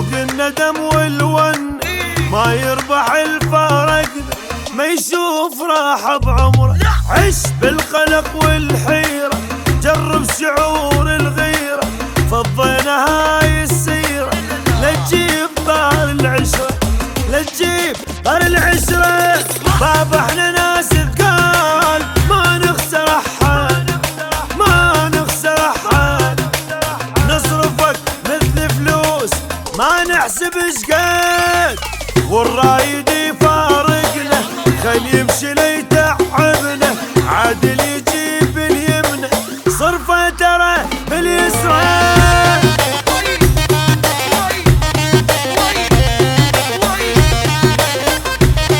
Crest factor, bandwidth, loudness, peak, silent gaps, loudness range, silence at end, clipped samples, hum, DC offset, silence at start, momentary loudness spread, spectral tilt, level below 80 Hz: 14 dB; 19.5 kHz; -13 LUFS; 0 dBFS; none; 3 LU; 0 s; under 0.1%; none; under 0.1%; 0 s; 6 LU; -4 dB/octave; -24 dBFS